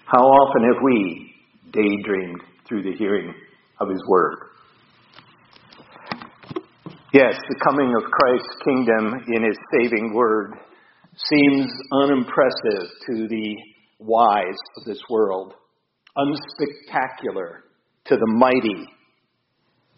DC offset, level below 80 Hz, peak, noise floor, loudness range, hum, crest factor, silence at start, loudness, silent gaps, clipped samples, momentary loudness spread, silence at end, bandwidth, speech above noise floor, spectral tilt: under 0.1%; -64 dBFS; 0 dBFS; -69 dBFS; 7 LU; none; 20 dB; 0.05 s; -20 LUFS; none; under 0.1%; 18 LU; 1.1 s; 5.8 kHz; 50 dB; -3.5 dB/octave